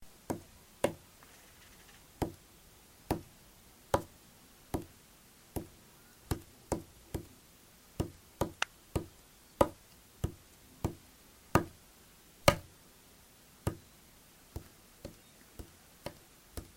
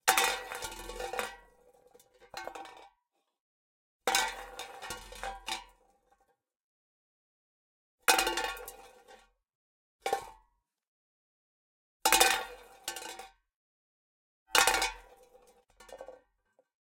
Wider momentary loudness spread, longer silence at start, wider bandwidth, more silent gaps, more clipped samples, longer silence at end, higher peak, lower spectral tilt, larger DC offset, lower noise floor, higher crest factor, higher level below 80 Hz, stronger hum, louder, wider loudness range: about the same, 25 LU vs 23 LU; about the same, 0 s vs 0.05 s; about the same, 16 kHz vs 17 kHz; second, none vs 3.40-4.00 s, 6.63-7.98 s, 9.55-9.99 s, 10.87-12.00 s, 13.55-14.46 s; neither; second, 0.1 s vs 0.8 s; about the same, -6 dBFS vs -4 dBFS; first, -5 dB/octave vs 0.5 dB/octave; neither; second, -60 dBFS vs -80 dBFS; about the same, 34 dB vs 32 dB; first, -52 dBFS vs -60 dBFS; neither; second, -38 LUFS vs -31 LUFS; second, 9 LU vs 13 LU